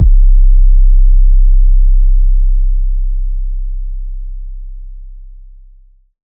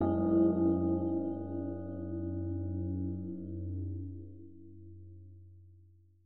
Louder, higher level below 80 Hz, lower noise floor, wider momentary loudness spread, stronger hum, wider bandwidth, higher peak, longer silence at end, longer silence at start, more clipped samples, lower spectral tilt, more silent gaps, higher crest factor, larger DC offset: first, -15 LUFS vs -34 LUFS; first, -8 dBFS vs -60 dBFS; second, -42 dBFS vs -61 dBFS; second, 19 LU vs 25 LU; neither; second, 0.3 kHz vs 1.8 kHz; first, 0 dBFS vs -18 dBFS; first, 1.1 s vs 0 s; about the same, 0 s vs 0 s; neither; about the same, -14 dB/octave vs -13.5 dB/octave; neither; second, 8 dB vs 16 dB; second, under 0.1% vs 0.2%